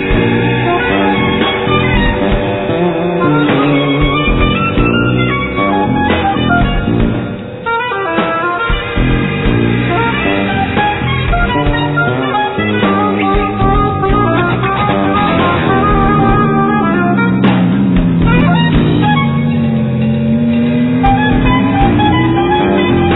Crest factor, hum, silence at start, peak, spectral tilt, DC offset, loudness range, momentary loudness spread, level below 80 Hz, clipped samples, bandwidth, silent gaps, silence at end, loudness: 12 dB; none; 0 s; 0 dBFS; -10.5 dB/octave; under 0.1%; 3 LU; 3 LU; -22 dBFS; under 0.1%; 4.1 kHz; none; 0 s; -12 LUFS